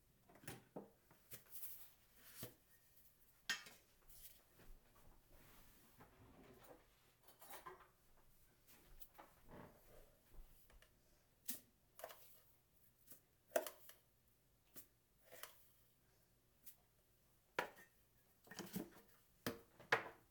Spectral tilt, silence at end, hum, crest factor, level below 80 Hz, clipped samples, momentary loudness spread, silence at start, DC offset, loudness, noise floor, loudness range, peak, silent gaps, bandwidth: -2.5 dB/octave; 0 s; none; 34 dB; -74 dBFS; under 0.1%; 21 LU; 0.1 s; under 0.1%; -52 LUFS; -77 dBFS; 12 LU; -22 dBFS; none; over 20 kHz